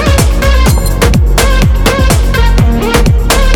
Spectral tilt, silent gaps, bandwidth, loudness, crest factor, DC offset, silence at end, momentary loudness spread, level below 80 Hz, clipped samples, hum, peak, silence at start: -5 dB/octave; none; 19.5 kHz; -9 LUFS; 6 dB; under 0.1%; 0 s; 1 LU; -10 dBFS; 0.6%; none; 0 dBFS; 0 s